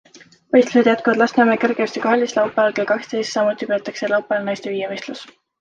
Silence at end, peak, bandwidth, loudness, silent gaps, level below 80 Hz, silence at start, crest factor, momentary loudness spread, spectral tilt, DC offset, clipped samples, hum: 0.35 s; -2 dBFS; 9 kHz; -18 LUFS; none; -66 dBFS; 0.15 s; 16 dB; 10 LU; -4.5 dB/octave; under 0.1%; under 0.1%; none